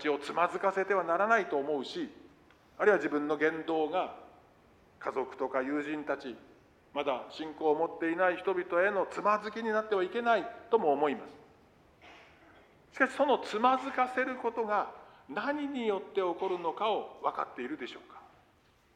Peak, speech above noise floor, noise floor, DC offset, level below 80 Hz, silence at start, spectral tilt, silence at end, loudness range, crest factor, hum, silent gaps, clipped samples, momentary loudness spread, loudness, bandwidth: -12 dBFS; 35 dB; -66 dBFS; under 0.1%; -74 dBFS; 0 s; -5 dB/octave; 0.75 s; 5 LU; 20 dB; none; none; under 0.1%; 12 LU; -32 LUFS; 11 kHz